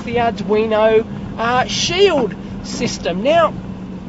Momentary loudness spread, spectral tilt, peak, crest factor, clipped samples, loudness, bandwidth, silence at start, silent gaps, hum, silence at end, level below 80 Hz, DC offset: 13 LU; -4.5 dB/octave; -2 dBFS; 16 dB; under 0.1%; -16 LUFS; 8 kHz; 0 s; none; none; 0 s; -40 dBFS; under 0.1%